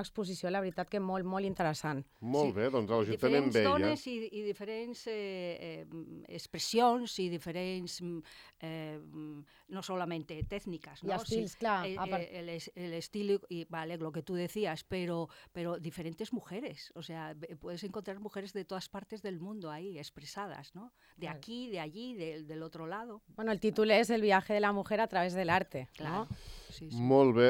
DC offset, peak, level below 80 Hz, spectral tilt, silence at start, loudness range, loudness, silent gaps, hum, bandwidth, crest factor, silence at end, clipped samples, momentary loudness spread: under 0.1%; -12 dBFS; -62 dBFS; -5.5 dB/octave; 0 s; 12 LU; -35 LUFS; none; none; 16.5 kHz; 22 dB; 0 s; under 0.1%; 17 LU